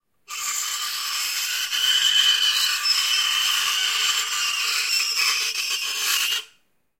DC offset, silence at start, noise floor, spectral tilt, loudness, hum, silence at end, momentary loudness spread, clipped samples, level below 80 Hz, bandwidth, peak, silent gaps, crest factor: under 0.1%; 0.3 s; -63 dBFS; 5 dB/octave; -20 LUFS; none; 0.55 s; 8 LU; under 0.1%; -76 dBFS; 16.5 kHz; -6 dBFS; none; 16 dB